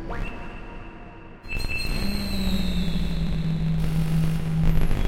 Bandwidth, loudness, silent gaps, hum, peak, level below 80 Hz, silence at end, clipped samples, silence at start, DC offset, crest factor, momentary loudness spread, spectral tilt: 16 kHz; -27 LUFS; none; none; -8 dBFS; -28 dBFS; 0 s; under 0.1%; 0 s; under 0.1%; 16 dB; 17 LU; -6.5 dB/octave